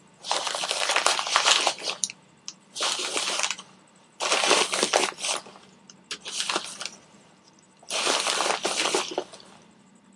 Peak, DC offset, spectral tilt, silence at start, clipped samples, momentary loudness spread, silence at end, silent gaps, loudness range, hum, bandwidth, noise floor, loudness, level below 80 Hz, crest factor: 0 dBFS; under 0.1%; 0.5 dB/octave; 0.2 s; under 0.1%; 16 LU; 0.65 s; none; 5 LU; none; 11.5 kHz; -56 dBFS; -24 LUFS; -80 dBFS; 28 dB